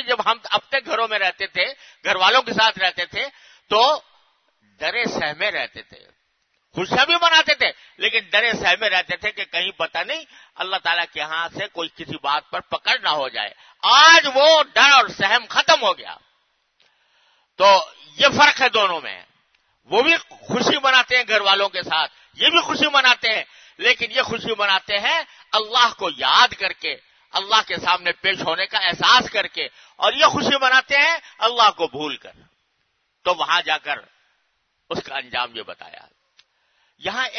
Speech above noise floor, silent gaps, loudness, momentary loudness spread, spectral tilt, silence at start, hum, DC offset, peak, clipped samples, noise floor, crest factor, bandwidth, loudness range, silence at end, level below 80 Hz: 51 dB; none; -18 LUFS; 14 LU; -1.5 dB/octave; 0 s; none; under 0.1%; 0 dBFS; under 0.1%; -70 dBFS; 20 dB; 6.6 kHz; 10 LU; 0 s; -62 dBFS